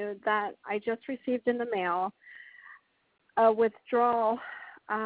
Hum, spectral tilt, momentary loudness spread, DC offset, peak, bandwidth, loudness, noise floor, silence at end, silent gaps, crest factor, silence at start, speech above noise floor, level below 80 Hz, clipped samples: none; -8.5 dB/octave; 19 LU; under 0.1%; -12 dBFS; 4 kHz; -29 LUFS; -56 dBFS; 0 s; none; 18 dB; 0 s; 28 dB; -76 dBFS; under 0.1%